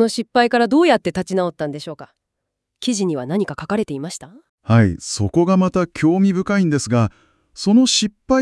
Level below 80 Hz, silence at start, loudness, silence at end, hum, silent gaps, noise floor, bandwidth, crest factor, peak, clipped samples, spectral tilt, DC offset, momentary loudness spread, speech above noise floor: -50 dBFS; 0 s; -18 LUFS; 0 s; none; 4.49-4.58 s; -78 dBFS; 12 kHz; 18 dB; 0 dBFS; under 0.1%; -5.5 dB/octave; under 0.1%; 12 LU; 61 dB